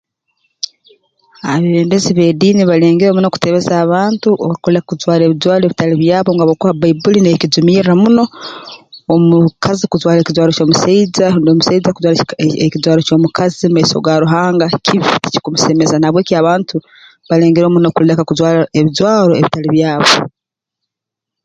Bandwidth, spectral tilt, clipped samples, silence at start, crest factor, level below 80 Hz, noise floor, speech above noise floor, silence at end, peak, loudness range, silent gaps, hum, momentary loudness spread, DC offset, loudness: 9.2 kHz; -6 dB/octave; under 0.1%; 1.45 s; 12 dB; -50 dBFS; -82 dBFS; 71 dB; 1.15 s; 0 dBFS; 1 LU; none; none; 6 LU; under 0.1%; -11 LUFS